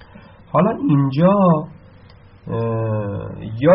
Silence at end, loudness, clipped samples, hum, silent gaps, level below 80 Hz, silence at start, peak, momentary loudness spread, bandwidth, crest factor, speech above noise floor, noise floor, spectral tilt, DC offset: 0 s; -18 LUFS; under 0.1%; none; none; -48 dBFS; 0.55 s; -2 dBFS; 14 LU; 5.6 kHz; 16 dB; 28 dB; -45 dBFS; -8.5 dB/octave; under 0.1%